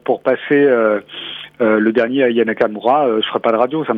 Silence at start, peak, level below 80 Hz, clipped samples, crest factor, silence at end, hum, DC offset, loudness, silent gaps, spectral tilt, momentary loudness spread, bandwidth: 0.05 s; 0 dBFS; -64 dBFS; under 0.1%; 14 dB; 0 s; none; under 0.1%; -15 LUFS; none; -7.5 dB/octave; 7 LU; 5 kHz